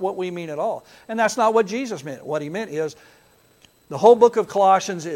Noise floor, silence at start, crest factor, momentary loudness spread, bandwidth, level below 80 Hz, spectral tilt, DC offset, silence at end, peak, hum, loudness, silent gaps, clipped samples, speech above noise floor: -56 dBFS; 0 s; 20 dB; 15 LU; 13.5 kHz; -68 dBFS; -4.5 dB/octave; under 0.1%; 0 s; -2 dBFS; none; -20 LUFS; none; under 0.1%; 36 dB